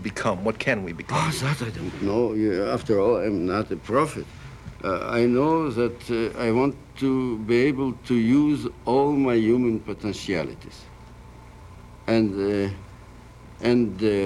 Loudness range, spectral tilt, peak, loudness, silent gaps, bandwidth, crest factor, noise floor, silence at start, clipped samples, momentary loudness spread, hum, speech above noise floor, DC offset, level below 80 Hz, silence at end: 5 LU; -6.5 dB/octave; -8 dBFS; -24 LUFS; none; 13 kHz; 16 dB; -45 dBFS; 0 s; under 0.1%; 10 LU; none; 22 dB; under 0.1%; -48 dBFS; 0 s